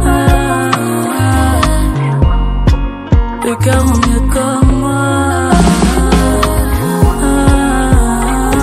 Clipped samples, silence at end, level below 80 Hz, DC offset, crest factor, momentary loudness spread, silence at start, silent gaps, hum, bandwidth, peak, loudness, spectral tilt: 0.3%; 0 s; -14 dBFS; under 0.1%; 10 dB; 4 LU; 0 s; none; none; 15 kHz; 0 dBFS; -12 LUFS; -6 dB/octave